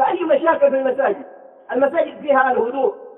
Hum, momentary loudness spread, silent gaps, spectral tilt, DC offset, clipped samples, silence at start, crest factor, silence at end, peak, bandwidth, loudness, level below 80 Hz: none; 6 LU; none; -8 dB/octave; under 0.1%; under 0.1%; 0 s; 16 dB; 0.05 s; -2 dBFS; 3.9 kHz; -18 LUFS; -68 dBFS